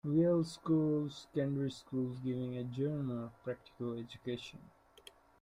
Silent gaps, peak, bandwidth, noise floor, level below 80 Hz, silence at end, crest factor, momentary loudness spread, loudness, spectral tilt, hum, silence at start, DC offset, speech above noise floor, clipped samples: none; -22 dBFS; 12 kHz; -61 dBFS; -70 dBFS; 0.75 s; 16 dB; 12 LU; -37 LUFS; -8 dB/octave; none; 0.05 s; under 0.1%; 25 dB; under 0.1%